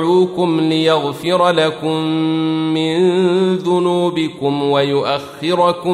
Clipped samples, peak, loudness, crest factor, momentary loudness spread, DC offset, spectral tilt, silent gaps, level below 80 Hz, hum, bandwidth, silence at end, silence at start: under 0.1%; -2 dBFS; -16 LUFS; 14 dB; 5 LU; under 0.1%; -6.5 dB/octave; none; -60 dBFS; none; 12.5 kHz; 0 s; 0 s